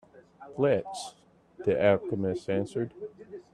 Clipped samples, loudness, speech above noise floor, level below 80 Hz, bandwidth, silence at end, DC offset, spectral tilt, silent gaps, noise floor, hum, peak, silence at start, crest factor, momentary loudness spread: under 0.1%; -29 LUFS; 20 dB; -66 dBFS; 12 kHz; 0.15 s; under 0.1%; -6.5 dB/octave; none; -49 dBFS; none; -10 dBFS; 0.15 s; 20 dB; 19 LU